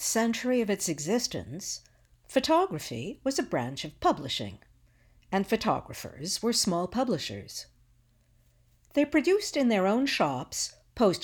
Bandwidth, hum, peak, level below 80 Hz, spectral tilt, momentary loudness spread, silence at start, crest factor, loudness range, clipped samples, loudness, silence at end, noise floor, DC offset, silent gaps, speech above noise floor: 19.5 kHz; none; -12 dBFS; -58 dBFS; -4 dB/octave; 11 LU; 0 s; 18 dB; 3 LU; under 0.1%; -29 LUFS; 0 s; -64 dBFS; under 0.1%; none; 36 dB